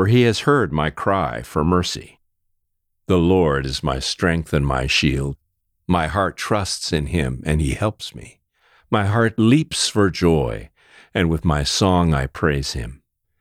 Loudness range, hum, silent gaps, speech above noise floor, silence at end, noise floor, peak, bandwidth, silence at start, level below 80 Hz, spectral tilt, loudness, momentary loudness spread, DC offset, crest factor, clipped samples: 4 LU; none; none; 52 dB; 0.45 s; -71 dBFS; -4 dBFS; 15 kHz; 0 s; -34 dBFS; -5.5 dB/octave; -19 LUFS; 10 LU; under 0.1%; 16 dB; under 0.1%